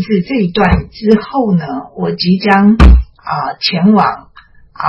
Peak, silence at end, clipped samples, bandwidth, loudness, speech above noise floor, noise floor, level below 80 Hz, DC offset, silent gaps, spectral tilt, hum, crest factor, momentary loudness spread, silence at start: 0 dBFS; 0 s; 2%; 6.4 kHz; -12 LUFS; 31 dB; -41 dBFS; -16 dBFS; under 0.1%; none; -8 dB/octave; none; 12 dB; 11 LU; 0 s